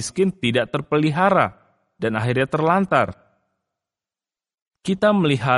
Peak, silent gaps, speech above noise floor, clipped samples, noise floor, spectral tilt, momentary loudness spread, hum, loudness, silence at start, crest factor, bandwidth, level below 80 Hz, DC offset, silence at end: -2 dBFS; 4.62-4.66 s; over 71 dB; under 0.1%; under -90 dBFS; -6 dB/octave; 9 LU; none; -20 LUFS; 0 s; 18 dB; 11.5 kHz; -56 dBFS; under 0.1%; 0 s